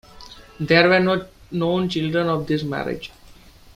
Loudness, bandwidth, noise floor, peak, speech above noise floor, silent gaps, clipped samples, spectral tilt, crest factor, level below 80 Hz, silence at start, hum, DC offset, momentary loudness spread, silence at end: -20 LUFS; 15 kHz; -47 dBFS; -2 dBFS; 27 dB; none; under 0.1%; -6.5 dB/octave; 20 dB; -50 dBFS; 0.15 s; none; under 0.1%; 16 LU; 0.45 s